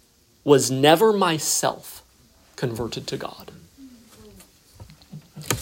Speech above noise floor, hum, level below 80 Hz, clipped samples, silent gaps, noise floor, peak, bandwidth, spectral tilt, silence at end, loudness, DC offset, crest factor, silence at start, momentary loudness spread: 35 dB; none; -56 dBFS; under 0.1%; none; -56 dBFS; -2 dBFS; 16.5 kHz; -3.5 dB/octave; 0 s; -21 LUFS; under 0.1%; 22 dB; 0.45 s; 26 LU